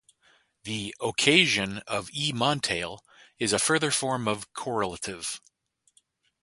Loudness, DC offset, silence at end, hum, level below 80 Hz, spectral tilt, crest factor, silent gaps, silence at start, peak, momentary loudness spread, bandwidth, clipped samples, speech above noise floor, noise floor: -26 LUFS; under 0.1%; 1.05 s; none; -60 dBFS; -2.5 dB/octave; 26 dB; none; 0.65 s; -2 dBFS; 15 LU; 12 kHz; under 0.1%; 40 dB; -67 dBFS